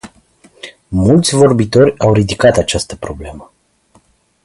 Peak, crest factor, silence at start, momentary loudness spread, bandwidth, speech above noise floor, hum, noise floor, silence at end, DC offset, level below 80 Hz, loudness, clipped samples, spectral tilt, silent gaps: 0 dBFS; 14 dB; 0.05 s; 21 LU; 11.5 kHz; 41 dB; none; -53 dBFS; 1 s; under 0.1%; -34 dBFS; -12 LUFS; under 0.1%; -5.5 dB/octave; none